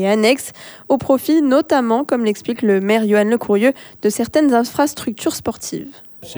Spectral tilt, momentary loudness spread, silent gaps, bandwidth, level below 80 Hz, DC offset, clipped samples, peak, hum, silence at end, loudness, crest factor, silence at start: -5 dB/octave; 12 LU; none; over 20 kHz; -54 dBFS; under 0.1%; under 0.1%; -2 dBFS; none; 0 s; -17 LUFS; 14 dB; 0 s